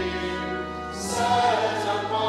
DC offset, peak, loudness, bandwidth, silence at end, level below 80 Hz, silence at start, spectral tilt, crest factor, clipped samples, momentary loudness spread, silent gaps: under 0.1%; -10 dBFS; -25 LUFS; 15 kHz; 0 s; -50 dBFS; 0 s; -3.5 dB/octave; 16 dB; under 0.1%; 10 LU; none